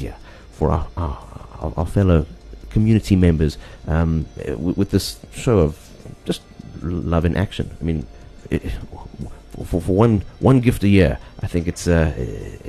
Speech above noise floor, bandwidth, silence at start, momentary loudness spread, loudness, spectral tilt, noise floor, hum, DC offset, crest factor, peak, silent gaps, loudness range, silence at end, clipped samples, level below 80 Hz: 20 dB; 13.5 kHz; 0 s; 19 LU; -20 LUFS; -7.5 dB/octave; -39 dBFS; none; under 0.1%; 18 dB; -2 dBFS; none; 6 LU; 0 s; under 0.1%; -28 dBFS